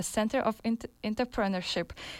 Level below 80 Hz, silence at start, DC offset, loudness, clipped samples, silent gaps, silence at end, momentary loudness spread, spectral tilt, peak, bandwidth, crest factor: -54 dBFS; 0 s; under 0.1%; -31 LUFS; under 0.1%; none; 0 s; 5 LU; -4.5 dB/octave; -16 dBFS; 16 kHz; 16 dB